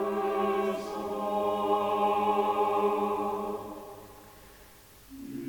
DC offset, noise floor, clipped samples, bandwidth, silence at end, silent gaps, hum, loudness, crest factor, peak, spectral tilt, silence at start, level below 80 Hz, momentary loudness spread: under 0.1%; -54 dBFS; under 0.1%; 19 kHz; 0 s; none; none; -29 LUFS; 14 dB; -16 dBFS; -5.5 dB/octave; 0 s; -62 dBFS; 19 LU